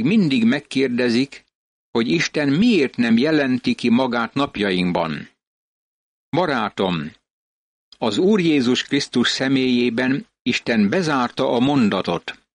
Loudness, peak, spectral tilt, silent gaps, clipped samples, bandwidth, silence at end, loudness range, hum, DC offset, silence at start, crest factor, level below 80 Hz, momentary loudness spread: -19 LUFS; -6 dBFS; -5.5 dB/octave; 1.55-1.93 s, 5.47-6.32 s, 7.30-7.92 s, 10.40-10.45 s; under 0.1%; 10 kHz; 0.2 s; 5 LU; none; under 0.1%; 0 s; 12 dB; -58 dBFS; 7 LU